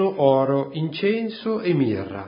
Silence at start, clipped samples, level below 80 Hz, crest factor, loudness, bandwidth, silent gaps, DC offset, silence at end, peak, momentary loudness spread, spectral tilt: 0 s; under 0.1%; -56 dBFS; 18 dB; -22 LUFS; 5.4 kHz; none; under 0.1%; 0 s; -4 dBFS; 7 LU; -12 dB/octave